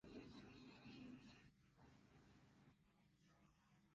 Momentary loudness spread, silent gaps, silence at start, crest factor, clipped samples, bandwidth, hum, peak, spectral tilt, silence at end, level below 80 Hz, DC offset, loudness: 3 LU; none; 0.05 s; 18 dB; under 0.1%; 7.4 kHz; none; -48 dBFS; -5 dB/octave; 0 s; -80 dBFS; under 0.1%; -62 LUFS